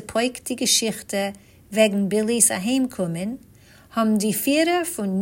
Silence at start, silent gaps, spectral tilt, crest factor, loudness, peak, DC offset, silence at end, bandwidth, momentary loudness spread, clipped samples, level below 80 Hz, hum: 0 s; none; -3.5 dB/octave; 20 dB; -21 LUFS; -2 dBFS; under 0.1%; 0 s; 16.5 kHz; 12 LU; under 0.1%; -60 dBFS; none